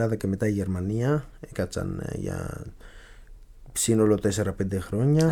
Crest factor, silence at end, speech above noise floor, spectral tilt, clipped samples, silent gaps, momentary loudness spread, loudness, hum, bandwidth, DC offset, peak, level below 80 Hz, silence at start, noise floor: 18 dB; 0 s; 21 dB; -6 dB/octave; under 0.1%; none; 12 LU; -26 LUFS; none; 19 kHz; under 0.1%; -8 dBFS; -46 dBFS; 0 s; -46 dBFS